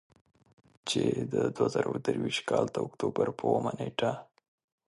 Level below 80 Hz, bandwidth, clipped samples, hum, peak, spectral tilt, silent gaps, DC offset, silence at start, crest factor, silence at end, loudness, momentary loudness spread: -66 dBFS; 11.5 kHz; under 0.1%; none; -12 dBFS; -5.5 dB/octave; none; under 0.1%; 0.85 s; 20 dB; 0.65 s; -31 LUFS; 4 LU